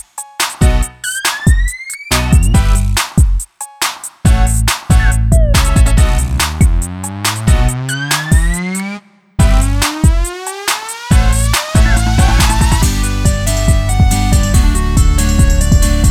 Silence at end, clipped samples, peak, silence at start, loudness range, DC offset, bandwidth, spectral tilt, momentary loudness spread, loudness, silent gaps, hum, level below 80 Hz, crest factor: 0 s; under 0.1%; 0 dBFS; 0.15 s; 2 LU; under 0.1%; 17 kHz; -4.5 dB/octave; 7 LU; -13 LUFS; none; none; -14 dBFS; 10 dB